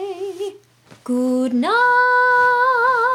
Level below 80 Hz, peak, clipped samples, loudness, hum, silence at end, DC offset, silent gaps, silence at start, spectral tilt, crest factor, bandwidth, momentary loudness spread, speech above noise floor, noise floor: -72 dBFS; -8 dBFS; under 0.1%; -16 LUFS; none; 0 s; under 0.1%; none; 0 s; -4 dB/octave; 10 dB; 14.5 kHz; 15 LU; 32 dB; -48 dBFS